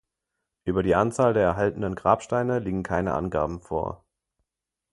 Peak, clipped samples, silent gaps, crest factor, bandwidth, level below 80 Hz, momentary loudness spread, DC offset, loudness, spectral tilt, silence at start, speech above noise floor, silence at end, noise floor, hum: -4 dBFS; under 0.1%; none; 22 dB; 11.5 kHz; -46 dBFS; 9 LU; under 0.1%; -25 LUFS; -7 dB/octave; 0.65 s; 61 dB; 1 s; -85 dBFS; none